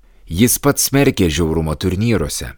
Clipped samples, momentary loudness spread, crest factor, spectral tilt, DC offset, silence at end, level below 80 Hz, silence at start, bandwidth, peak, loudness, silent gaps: under 0.1%; 6 LU; 16 dB; -4.5 dB/octave; under 0.1%; 0.05 s; -32 dBFS; 0.25 s; over 20 kHz; 0 dBFS; -16 LUFS; none